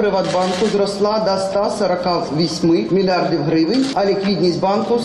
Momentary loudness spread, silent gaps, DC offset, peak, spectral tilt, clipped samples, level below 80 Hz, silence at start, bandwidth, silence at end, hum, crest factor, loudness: 2 LU; none; under 0.1%; -8 dBFS; -6 dB/octave; under 0.1%; -50 dBFS; 0 s; 11.5 kHz; 0 s; none; 10 dB; -17 LUFS